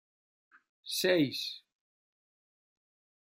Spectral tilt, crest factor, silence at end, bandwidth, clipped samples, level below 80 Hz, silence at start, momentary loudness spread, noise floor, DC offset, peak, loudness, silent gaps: -4 dB/octave; 24 dB; 1.75 s; 16 kHz; under 0.1%; -82 dBFS; 0.85 s; 20 LU; under -90 dBFS; under 0.1%; -14 dBFS; -31 LUFS; none